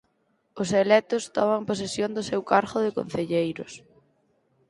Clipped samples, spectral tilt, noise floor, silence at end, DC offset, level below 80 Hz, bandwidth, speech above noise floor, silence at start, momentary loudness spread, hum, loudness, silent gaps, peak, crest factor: under 0.1%; -5 dB/octave; -70 dBFS; 0.9 s; under 0.1%; -62 dBFS; 11.5 kHz; 46 dB; 0.55 s; 11 LU; none; -25 LUFS; none; -4 dBFS; 22 dB